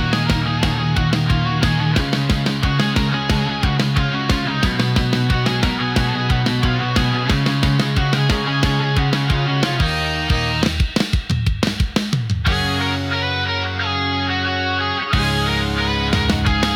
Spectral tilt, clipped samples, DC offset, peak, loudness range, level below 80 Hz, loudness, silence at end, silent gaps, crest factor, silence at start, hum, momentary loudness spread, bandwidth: -5.5 dB/octave; under 0.1%; under 0.1%; -4 dBFS; 2 LU; -28 dBFS; -18 LUFS; 0 s; none; 14 dB; 0 s; none; 3 LU; 17.5 kHz